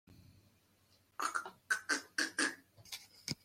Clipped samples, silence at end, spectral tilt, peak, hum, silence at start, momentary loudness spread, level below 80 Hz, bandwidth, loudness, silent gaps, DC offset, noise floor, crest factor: under 0.1%; 0.1 s; -1 dB/octave; -20 dBFS; none; 0.1 s; 14 LU; -80 dBFS; 16.5 kHz; -38 LUFS; none; under 0.1%; -71 dBFS; 22 dB